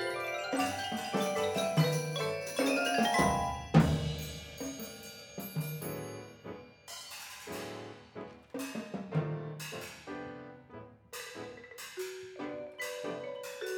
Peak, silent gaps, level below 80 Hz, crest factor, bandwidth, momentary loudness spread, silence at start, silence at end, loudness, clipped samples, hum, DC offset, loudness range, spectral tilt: -12 dBFS; none; -54 dBFS; 24 dB; over 20 kHz; 18 LU; 0 s; 0 s; -35 LUFS; under 0.1%; none; under 0.1%; 13 LU; -5 dB/octave